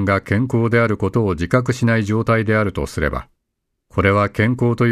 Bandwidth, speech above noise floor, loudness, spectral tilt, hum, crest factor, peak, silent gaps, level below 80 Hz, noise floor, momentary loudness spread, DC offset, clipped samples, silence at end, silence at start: 13 kHz; 58 dB; -18 LUFS; -7.5 dB/octave; none; 18 dB; 0 dBFS; none; -38 dBFS; -75 dBFS; 6 LU; under 0.1%; under 0.1%; 0 s; 0 s